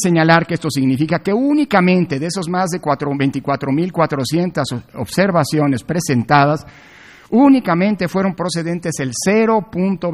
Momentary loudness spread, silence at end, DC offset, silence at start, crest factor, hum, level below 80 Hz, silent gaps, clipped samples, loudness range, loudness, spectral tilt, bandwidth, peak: 8 LU; 0 s; under 0.1%; 0 s; 16 dB; none; -52 dBFS; none; under 0.1%; 2 LU; -16 LUFS; -6 dB/octave; 14.5 kHz; 0 dBFS